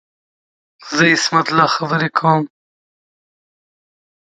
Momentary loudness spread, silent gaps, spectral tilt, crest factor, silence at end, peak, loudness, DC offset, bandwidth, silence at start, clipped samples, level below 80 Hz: 7 LU; none; -4 dB/octave; 18 dB; 1.8 s; 0 dBFS; -15 LUFS; under 0.1%; 9.4 kHz; 0.8 s; under 0.1%; -64 dBFS